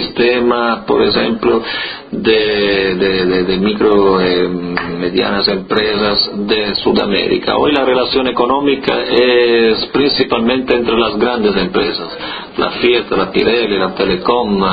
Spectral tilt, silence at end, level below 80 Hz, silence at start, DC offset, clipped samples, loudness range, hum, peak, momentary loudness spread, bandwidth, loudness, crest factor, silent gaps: -8 dB/octave; 0 s; -40 dBFS; 0 s; under 0.1%; under 0.1%; 2 LU; none; 0 dBFS; 6 LU; 5 kHz; -13 LUFS; 14 dB; none